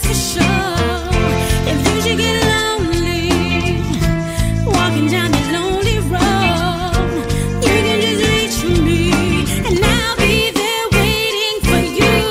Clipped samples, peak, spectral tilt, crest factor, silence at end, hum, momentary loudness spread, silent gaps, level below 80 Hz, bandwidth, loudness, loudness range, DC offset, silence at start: under 0.1%; -2 dBFS; -4.5 dB/octave; 12 dB; 0 s; none; 4 LU; none; -24 dBFS; 16 kHz; -15 LUFS; 2 LU; under 0.1%; 0 s